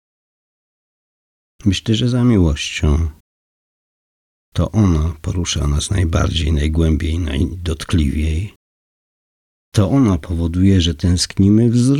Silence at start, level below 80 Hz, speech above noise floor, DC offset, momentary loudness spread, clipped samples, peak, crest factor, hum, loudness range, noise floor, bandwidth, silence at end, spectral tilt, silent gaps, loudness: 1.65 s; -28 dBFS; over 75 dB; under 0.1%; 8 LU; under 0.1%; -4 dBFS; 14 dB; none; 3 LU; under -90 dBFS; 12 kHz; 0 s; -6 dB/octave; 3.20-4.52 s, 8.56-9.72 s; -17 LUFS